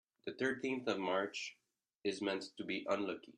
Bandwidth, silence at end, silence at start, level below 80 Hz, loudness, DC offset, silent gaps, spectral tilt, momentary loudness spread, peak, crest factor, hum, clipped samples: 10.5 kHz; 0.05 s; 0.25 s; -82 dBFS; -40 LUFS; under 0.1%; 1.95-2.00 s; -4 dB/octave; 7 LU; -22 dBFS; 18 dB; none; under 0.1%